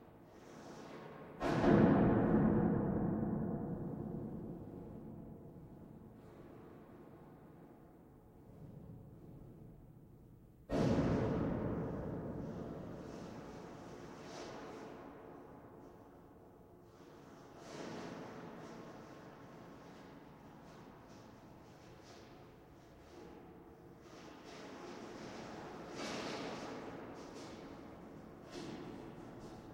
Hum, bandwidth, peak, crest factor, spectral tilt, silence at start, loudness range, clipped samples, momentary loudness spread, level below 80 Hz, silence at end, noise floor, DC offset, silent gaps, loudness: none; 16 kHz; -16 dBFS; 26 dB; -7.5 dB/octave; 0 s; 23 LU; under 0.1%; 24 LU; -58 dBFS; 0 s; -60 dBFS; under 0.1%; none; -40 LUFS